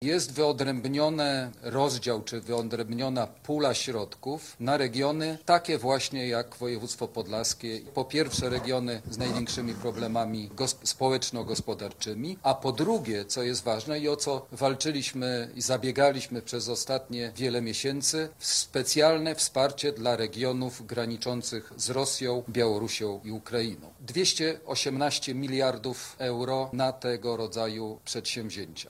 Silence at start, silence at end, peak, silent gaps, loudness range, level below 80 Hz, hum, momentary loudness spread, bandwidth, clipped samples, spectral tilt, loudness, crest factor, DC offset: 0 s; 0 s; -8 dBFS; none; 4 LU; -60 dBFS; none; 8 LU; 16 kHz; under 0.1%; -3.5 dB/octave; -29 LUFS; 20 dB; under 0.1%